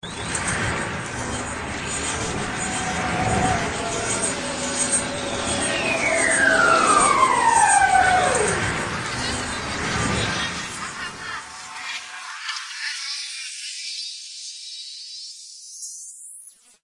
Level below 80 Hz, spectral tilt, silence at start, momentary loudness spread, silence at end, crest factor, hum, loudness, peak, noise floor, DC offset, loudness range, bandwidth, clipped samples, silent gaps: -44 dBFS; -2.5 dB/octave; 0.05 s; 17 LU; 0.35 s; 18 dB; none; -21 LUFS; -4 dBFS; -45 dBFS; under 0.1%; 13 LU; 11.5 kHz; under 0.1%; none